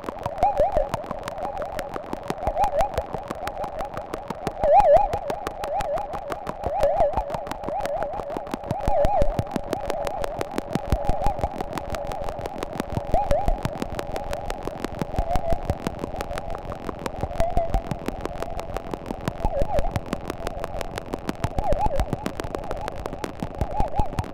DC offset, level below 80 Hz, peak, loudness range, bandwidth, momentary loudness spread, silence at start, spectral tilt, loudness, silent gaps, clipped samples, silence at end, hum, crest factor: under 0.1%; -32 dBFS; -6 dBFS; 7 LU; 16.5 kHz; 10 LU; 0 s; -6.5 dB/octave; -27 LUFS; none; under 0.1%; 0 s; none; 20 dB